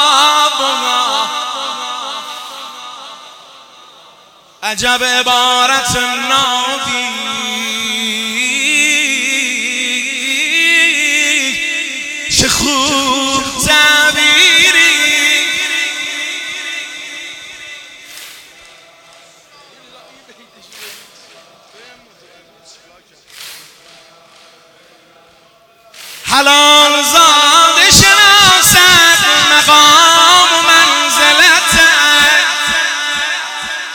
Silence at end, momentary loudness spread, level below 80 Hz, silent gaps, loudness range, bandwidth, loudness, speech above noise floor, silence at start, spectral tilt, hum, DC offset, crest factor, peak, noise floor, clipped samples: 0 s; 20 LU; -42 dBFS; none; 16 LU; over 20 kHz; -8 LUFS; 35 dB; 0 s; -0.5 dB/octave; none; under 0.1%; 12 dB; 0 dBFS; -47 dBFS; 0.3%